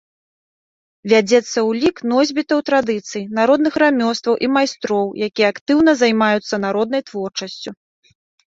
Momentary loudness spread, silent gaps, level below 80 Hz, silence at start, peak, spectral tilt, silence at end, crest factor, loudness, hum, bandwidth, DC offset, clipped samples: 11 LU; 5.61-5.66 s; -60 dBFS; 1.05 s; -2 dBFS; -4.5 dB/octave; 0.75 s; 16 dB; -17 LUFS; none; 7.8 kHz; under 0.1%; under 0.1%